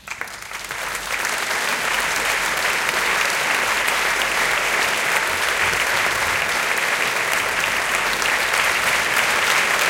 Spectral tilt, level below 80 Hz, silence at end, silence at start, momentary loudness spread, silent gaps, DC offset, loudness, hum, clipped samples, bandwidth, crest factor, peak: 0 dB/octave; -48 dBFS; 0 s; 0.05 s; 5 LU; none; under 0.1%; -18 LUFS; none; under 0.1%; 17 kHz; 18 dB; -2 dBFS